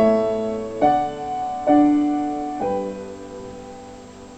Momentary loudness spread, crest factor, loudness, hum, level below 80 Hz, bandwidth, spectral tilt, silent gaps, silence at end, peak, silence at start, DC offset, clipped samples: 21 LU; 16 dB; -21 LUFS; none; -50 dBFS; 8.4 kHz; -7 dB/octave; none; 0 s; -4 dBFS; 0 s; under 0.1%; under 0.1%